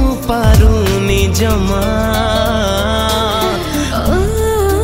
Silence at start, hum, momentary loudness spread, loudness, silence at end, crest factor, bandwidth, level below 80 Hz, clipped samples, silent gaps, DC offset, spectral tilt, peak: 0 s; none; 5 LU; -13 LUFS; 0 s; 12 dB; 16.5 kHz; -18 dBFS; under 0.1%; none; under 0.1%; -5.5 dB/octave; 0 dBFS